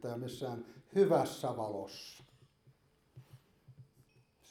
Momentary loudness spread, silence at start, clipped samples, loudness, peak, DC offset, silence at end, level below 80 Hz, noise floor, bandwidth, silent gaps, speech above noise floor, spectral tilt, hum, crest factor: 19 LU; 0 s; under 0.1%; -35 LUFS; -18 dBFS; under 0.1%; 0.65 s; -76 dBFS; -68 dBFS; 16.5 kHz; none; 33 dB; -6 dB/octave; none; 22 dB